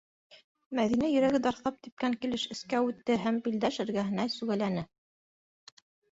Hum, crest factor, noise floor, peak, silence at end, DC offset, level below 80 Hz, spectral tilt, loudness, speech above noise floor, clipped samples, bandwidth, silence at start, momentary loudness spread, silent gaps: none; 16 dB; under -90 dBFS; -16 dBFS; 1.25 s; under 0.1%; -66 dBFS; -5.5 dB/octave; -31 LUFS; over 60 dB; under 0.1%; 8 kHz; 0.3 s; 9 LU; 0.44-0.55 s, 0.66-0.71 s, 1.92-1.97 s